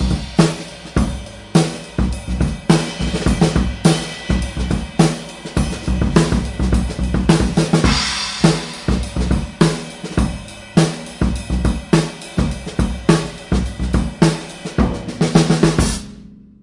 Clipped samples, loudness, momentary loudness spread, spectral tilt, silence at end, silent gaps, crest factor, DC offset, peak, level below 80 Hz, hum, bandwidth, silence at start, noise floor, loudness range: under 0.1%; -18 LUFS; 7 LU; -5.5 dB/octave; 0.25 s; none; 18 dB; under 0.1%; 0 dBFS; -24 dBFS; none; 11.5 kHz; 0 s; -39 dBFS; 3 LU